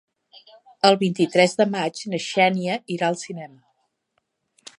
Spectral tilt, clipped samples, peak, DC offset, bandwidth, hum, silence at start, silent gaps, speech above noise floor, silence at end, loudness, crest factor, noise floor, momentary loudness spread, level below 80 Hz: -4.5 dB/octave; under 0.1%; -2 dBFS; under 0.1%; 11 kHz; none; 0.85 s; none; 53 dB; 1.3 s; -21 LUFS; 22 dB; -74 dBFS; 13 LU; -74 dBFS